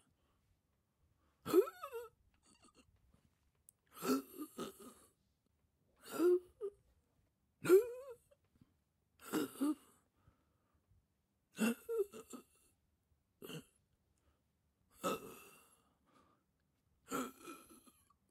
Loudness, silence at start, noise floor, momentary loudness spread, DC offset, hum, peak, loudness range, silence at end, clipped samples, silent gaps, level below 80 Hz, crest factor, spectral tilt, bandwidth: -39 LUFS; 1.45 s; -83 dBFS; 23 LU; under 0.1%; none; -18 dBFS; 12 LU; 0.75 s; under 0.1%; none; -82 dBFS; 24 dB; -5 dB/octave; 16 kHz